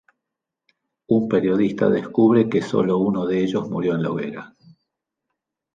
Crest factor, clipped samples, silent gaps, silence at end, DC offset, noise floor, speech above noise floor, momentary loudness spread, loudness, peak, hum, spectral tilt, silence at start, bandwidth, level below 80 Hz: 18 dB; under 0.1%; none; 1.3 s; under 0.1%; -84 dBFS; 64 dB; 8 LU; -20 LUFS; -4 dBFS; none; -8 dB/octave; 1.1 s; 7.6 kHz; -60 dBFS